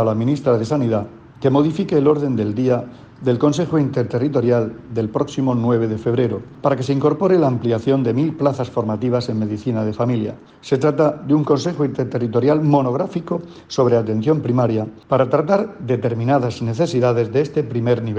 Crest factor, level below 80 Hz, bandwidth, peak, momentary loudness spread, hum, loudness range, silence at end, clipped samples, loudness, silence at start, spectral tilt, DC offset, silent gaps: 14 dB; -54 dBFS; 8.6 kHz; -4 dBFS; 6 LU; none; 1 LU; 0 s; under 0.1%; -19 LUFS; 0 s; -8 dB/octave; under 0.1%; none